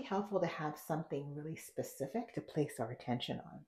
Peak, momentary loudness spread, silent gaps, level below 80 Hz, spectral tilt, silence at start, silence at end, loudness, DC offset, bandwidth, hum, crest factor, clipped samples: -22 dBFS; 7 LU; none; -74 dBFS; -6 dB/octave; 0 s; 0.05 s; -41 LUFS; under 0.1%; 15.5 kHz; none; 18 dB; under 0.1%